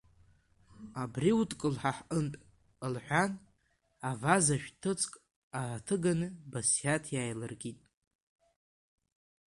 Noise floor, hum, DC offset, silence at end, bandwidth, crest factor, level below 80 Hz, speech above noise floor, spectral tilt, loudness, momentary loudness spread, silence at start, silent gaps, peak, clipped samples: -74 dBFS; none; under 0.1%; 1.8 s; 11.5 kHz; 22 dB; -64 dBFS; 41 dB; -4.5 dB/octave; -33 LUFS; 14 LU; 0.75 s; 5.36-5.51 s; -12 dBFS; under 0.1%